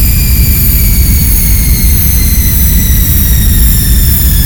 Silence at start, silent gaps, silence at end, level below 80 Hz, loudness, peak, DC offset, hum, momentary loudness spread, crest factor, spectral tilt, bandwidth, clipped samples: 0 s; none; 0 s; -8 dBFS; -7 LUFS; 0 dBFS; under 0.1%; none; 1 LU; 6 dB; -4 dB/octave; over 20 kHz; 0.7%